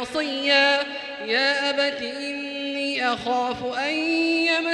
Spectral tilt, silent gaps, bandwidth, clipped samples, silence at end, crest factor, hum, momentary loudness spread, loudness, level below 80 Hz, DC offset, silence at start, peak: -2.5 dB/octave; none; 11.5 kHz; under 0.1%; 0 s; 18 dB; none; 11 LU; -22 LUFS; -64 dBFS; under 0.1%; 0 s; -6 dBFS